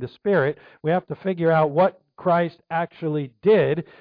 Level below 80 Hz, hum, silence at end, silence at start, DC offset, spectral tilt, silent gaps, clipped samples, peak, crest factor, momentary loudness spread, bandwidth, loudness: -64 dBFS; none; 0.2 s; 0 s; under 0.1%; -10.5 dB/octave; none; under 0.1%; -8 dBFS; 14 dB; 9 LU; 5.2 kHz; -22 LUFS